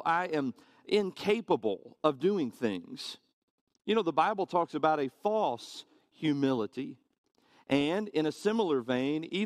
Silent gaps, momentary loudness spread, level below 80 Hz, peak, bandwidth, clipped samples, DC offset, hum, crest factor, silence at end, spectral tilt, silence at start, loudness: 3.33-3.67 s, 7.18-7.24 s; 12 LU; -74 dBFS; -10 dBFS; 14 kHz; under 0.1%; under 0.1%; none; 22 dB; 0 s; -6 dB/octave; 0 s; -31 LUFS